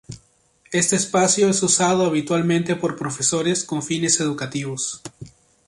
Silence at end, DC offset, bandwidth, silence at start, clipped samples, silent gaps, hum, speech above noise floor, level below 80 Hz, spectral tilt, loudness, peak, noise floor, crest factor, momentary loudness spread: 0.4 s; under 0.1%; 11.5 kHz; 0.1 s; under 0.1%; none; none; 38 dB; -58 dBFS; -3.5 dB/octave; -20 LUFS; -4 dBFS; -58 dBFS; 18 dB; 10 LU